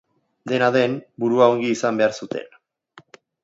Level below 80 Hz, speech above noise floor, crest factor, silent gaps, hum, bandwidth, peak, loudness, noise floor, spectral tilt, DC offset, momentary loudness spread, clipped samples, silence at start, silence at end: -70 dBFS; 32 dB; 18 dB; none; none; 8 kHz; -2 dBFS; -20 LUFS; -52 dBFS; -5.5 dB/octave; under 0.1%; 15 LU; under 0.1%; 0.45 s; 0.95 s